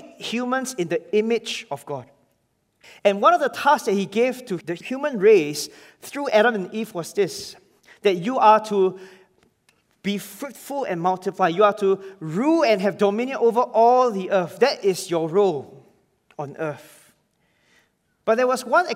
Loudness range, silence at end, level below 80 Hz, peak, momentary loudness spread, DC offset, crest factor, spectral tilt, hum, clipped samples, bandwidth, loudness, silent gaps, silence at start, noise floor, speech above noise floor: 6 LU; 0 s; -76 dBFS; -4 dBFS; 15 LU; under 0.1%; 18 dB; -5 dB/octave; none; under 0.1%; 16 kHz; -21 LUFS; none; 0.05 s; -69 dBFS; 48 dB